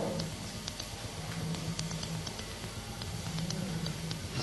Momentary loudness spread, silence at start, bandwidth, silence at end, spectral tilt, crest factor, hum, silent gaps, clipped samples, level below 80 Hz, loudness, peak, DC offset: 4 LU; 0 s; 12 kHz; 0 s; -4.5 dB/octave; 24 dB; none; none; under 0.1%; -52 dBFS; -38 LUFS; -14 dBFS; under 0.1%